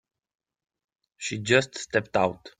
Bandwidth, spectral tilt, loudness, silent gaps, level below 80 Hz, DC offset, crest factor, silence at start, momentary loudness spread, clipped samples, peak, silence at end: 9.6 kHz; -4 dB/octave; -25 LUFS; none; -62 dBFS; under 0.1%; 24 dB; 1.2 s; 10 LU; under 0.1%; -4 dBFS; 0.1 s